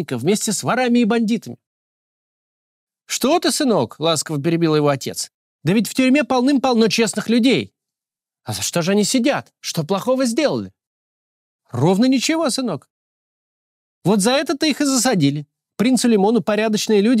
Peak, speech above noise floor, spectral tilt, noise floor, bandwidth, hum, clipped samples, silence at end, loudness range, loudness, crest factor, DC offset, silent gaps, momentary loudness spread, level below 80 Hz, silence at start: -6 dBFS; 72 dB; -4.5 dB/octave; -89 dBFS; 16 kHz; none; under 0.1%; 0 s; 4 LU; -18 LUFS; 14 dB; under 0.1%; 1.66-2.87 s, 5.34-5.59 s, 10.87-11.59 s, 12.90-14.02 s; 10 LU; -64 dBFS; 0 s